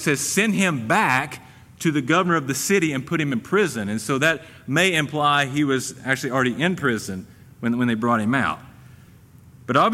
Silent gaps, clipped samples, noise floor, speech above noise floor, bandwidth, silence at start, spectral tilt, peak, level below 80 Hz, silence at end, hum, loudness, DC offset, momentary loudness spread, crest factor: none; under 0.1%; -48 dBFS; 27 dB; 16 kHz; 0 s; -4.5 dB/octave; -4 dBFS; -58 dBFS; 0 s; none; -21 LUFS; under 0.1%; 8 LU; 18 dB